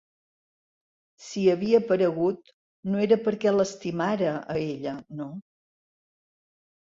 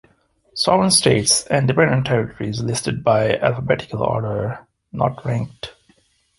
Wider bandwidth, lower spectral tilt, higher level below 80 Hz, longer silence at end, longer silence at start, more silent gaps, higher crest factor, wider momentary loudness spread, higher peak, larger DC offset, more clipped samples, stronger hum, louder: second, 7.8 kHz vs 12 kHz; first, -6.5 dB/octave vs -4 dB/octave; second, -66 dBFS vs -48 dBFS; first, 1.4 s vs 0.7 s; first, 1.2 s vs 0.55 s; first, 2.53-2.83 s vs none; about the same, 18 dB vs 20 dB; about the same, 15 LU vs 16 LU; second, -8 dBFS vs 0 dBFS; neither; neither; neither; second, -25 LUFS vs -18 LUFS